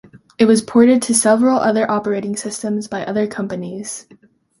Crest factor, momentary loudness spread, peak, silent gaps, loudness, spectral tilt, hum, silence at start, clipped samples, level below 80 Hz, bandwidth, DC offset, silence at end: 16 dB; 14 LU; 0 dBFS; none; -16 LUFS; -4.5 dB/octave; none; 0.15 s; under 0.1%; -58 dBFS; 11.5 kHz; under 0.1%; 0.6 s